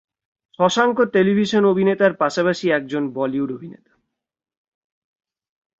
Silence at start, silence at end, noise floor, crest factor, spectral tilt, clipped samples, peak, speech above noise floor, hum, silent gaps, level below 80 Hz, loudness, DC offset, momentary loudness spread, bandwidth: 0.6 s; 2.05 s; -72 dBFS; 18 dB; -5.5 dB/octave; under 0.1%; -2 dBFS; 54 dB; none; none; -64 dBFS; -19 LUFS; under 0.1%; 8 LU; 7.8 kHz